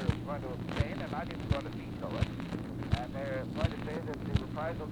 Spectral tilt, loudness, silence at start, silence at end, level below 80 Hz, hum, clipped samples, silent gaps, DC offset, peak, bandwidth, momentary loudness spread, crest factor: -7.5 dB/octave; -36 LUFS; 0 s; 0 s; -44 dBFS; none; under 0.1%; none; under 0.1%; -14 dBFS; 17.5 kHz; 4 LU; 20 dB